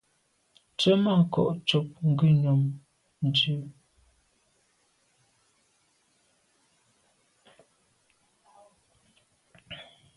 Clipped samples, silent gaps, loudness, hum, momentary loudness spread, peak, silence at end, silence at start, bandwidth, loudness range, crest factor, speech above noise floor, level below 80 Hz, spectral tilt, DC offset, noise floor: under 0.1%; none; -25 LUFS; none; 22 LU; -10 dBFS; 0.35 s; 0.8 s; 11 kHz; 8 LU; 20 dB; 47 dB; -68 dBFS; -7 dB/octave; under 0.1%; -71 dBFS